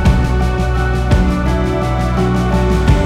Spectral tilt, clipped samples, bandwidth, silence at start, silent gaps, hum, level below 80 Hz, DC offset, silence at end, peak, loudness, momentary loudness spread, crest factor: -7 dB/octave; under 0.1%; 12 kHz; 0 s; none; none; -16 dBFS; under 0.1%; 0 s; 0 dBFS; -15 LUFS; 3 LU; 12 dB